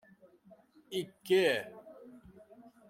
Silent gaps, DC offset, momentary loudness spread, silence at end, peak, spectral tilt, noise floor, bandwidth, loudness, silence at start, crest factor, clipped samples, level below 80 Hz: none; under 0.1%; 26 LU; 0.75 s; -16 dBFS; -4.5 dB/octave; -62 dBFS; 16.5 kHz; -32 LUFS; 0.9 s; 20 dB; under 0.1%; -76 dBFS